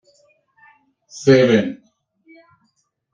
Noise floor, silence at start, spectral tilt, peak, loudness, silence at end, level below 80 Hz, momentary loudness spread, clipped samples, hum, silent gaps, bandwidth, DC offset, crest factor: -68 dBFS; 1.15 s; -6 dB/octave; -2 dBFS; -16 LUFS; 1.4 s; -60 dBFS; 26 LU; under 0.1%; none; none; 7.6 kHz; under 0.1%; 20 dB